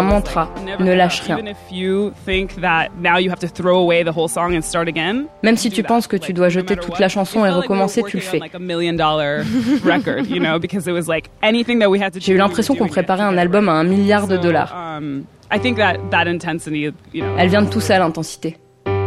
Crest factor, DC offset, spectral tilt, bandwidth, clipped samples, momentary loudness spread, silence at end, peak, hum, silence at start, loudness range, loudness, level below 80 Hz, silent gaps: 16 dB; under 0.1%; -5.5 dB/octave; 14.5 kHz; under 0.1%; 9 LU; 0 s; 0 dBFS; none; 0 s; 2 LU; -17 LUFS; -40 dBFS; none